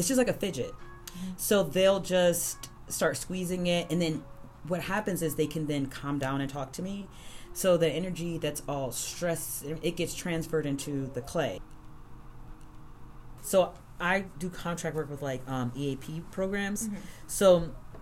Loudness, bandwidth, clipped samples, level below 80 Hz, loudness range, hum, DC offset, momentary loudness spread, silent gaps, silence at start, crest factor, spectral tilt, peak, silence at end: -30 LUFS; 16 kHz; under 0.1%; -50 dBFS; 6 LU; none; under 0.1%; 14 LU; none; 0 s; 20 dB; -4.5 dB/octave; -10 dBFS; 0 s